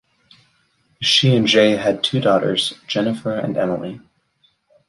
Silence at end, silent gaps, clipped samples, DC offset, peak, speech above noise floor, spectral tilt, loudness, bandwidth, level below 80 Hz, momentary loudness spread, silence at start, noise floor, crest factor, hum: 0.9 s; none; under 0.1%; under 0.1%; -2 dBFS; 45 dB; -5 dB/octave; -17 LUFS; 11.5 kHz; -58 dBFS; 10 LU; 1 s; -62 dBFS; 16 dB; none